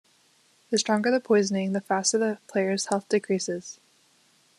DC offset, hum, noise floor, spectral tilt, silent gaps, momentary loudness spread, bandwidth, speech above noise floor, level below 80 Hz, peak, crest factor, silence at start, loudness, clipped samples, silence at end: under 0.1%; none; -63 dBFS; -4 dB/octave; none; 6 LU; 12 kHz; 38 dB; -74 dBFS; -8 dBFS; 20 dB; 0.7 s; -25 LUFS; under 0.1%; 0.85 s